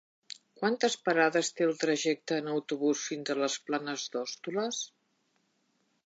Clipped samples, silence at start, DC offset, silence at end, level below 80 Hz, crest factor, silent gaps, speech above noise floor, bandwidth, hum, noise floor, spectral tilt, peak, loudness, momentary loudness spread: under 0.1%; 0.6 s; under 0.1%; 1.2 s; -88 dBFS; 20 dB; none; 44 dB; 9.2 kHz; none; -75 dBFS; -3 dB/octave; -12 dBFS; -31 LUFS; 10 LU